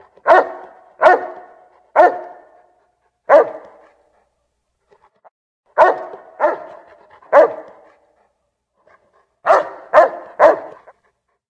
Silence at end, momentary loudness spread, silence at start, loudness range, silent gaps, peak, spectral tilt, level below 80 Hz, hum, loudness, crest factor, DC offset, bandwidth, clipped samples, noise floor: 0.8 s; 21 LU; 0.25 s; 5 LU; 5.31-5.63 s; 0 dBFS; -4.5 dB/octave; -64 dBFS; none; -15 LUFS; 18 dB; under 0.1%; 8.4 kHz; under 0.1%; -70 dBFS